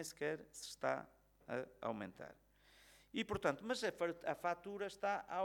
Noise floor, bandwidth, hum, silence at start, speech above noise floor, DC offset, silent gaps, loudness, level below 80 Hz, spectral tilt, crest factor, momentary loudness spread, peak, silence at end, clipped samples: -68 dBFS; 19 kHz; 50 Hz at -75 dBFS; 0 s; 25 dB; under 0.1%; none; -43 LUFS; -72 dBFS; -4 dB/octave; 22 dB; 12 LU; -22 dBFS; 0 s; under 0.1%